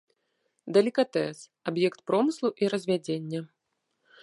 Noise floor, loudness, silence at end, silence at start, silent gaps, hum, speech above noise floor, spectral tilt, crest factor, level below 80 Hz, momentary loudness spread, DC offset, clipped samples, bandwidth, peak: -79 dBFS; -28 LUFS; 0.75 s; 0.65 s; none; none; 52 dB; -6 dB/octave; 20 dB; -78 dBFS; 12 LU; under 0.1%; under 0.1%; 11.5 kHz; -10 dBFS